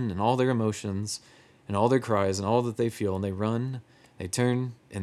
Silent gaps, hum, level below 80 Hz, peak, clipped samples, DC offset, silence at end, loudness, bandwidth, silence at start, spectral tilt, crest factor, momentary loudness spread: none; none; -68 dBFS; -8 dBFS; under 0.1%; under 0.1%; 0 s; -28 LUFS; 13.5 kHz; 0 s; -6 dB/octave; 18 dB; 11 LU